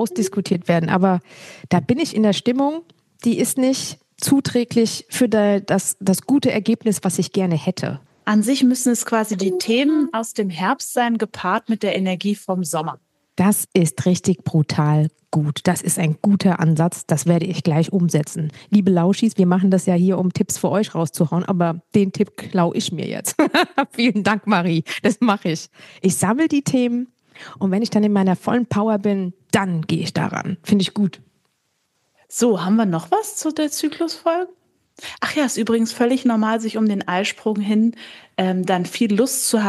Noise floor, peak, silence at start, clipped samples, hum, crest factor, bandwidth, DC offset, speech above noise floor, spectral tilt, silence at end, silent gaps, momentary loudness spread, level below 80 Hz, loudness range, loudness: -69 dBFS; -2 dBFS; 0 s; under 0.1%; none; 18 dB; 12.5 kHz; under 0.1%; 50 dB; -5.5 dB/octave; 0 s; none; 7 LU; -64 dBFS; 3 LU; -19 LUFS